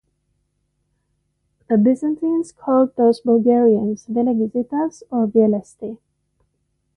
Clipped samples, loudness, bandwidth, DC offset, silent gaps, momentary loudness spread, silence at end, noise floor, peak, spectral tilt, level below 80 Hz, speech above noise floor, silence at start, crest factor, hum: under 0.1%; -18 LUFS; 10 kHz; under 0.1%; none; 8 LU; 1 s; -70 dBFS; -4 dBFS; -8.5 dB/octave; -62 dBFS; 53 dB; 1.7 s; 16 dB; none